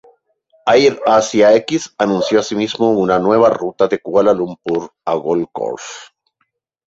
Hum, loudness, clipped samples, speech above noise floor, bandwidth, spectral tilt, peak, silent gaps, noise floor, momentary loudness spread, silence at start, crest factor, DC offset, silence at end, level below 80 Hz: none; -15 LUFS; under 0.1%; 54 dB; 8 kHz; -5 dB/octave; 0 dBFS; none; -68 dBFS; 11 LU; 0.65 s; 14 dB; under 0.1%; 0.85 s; -56 dBFS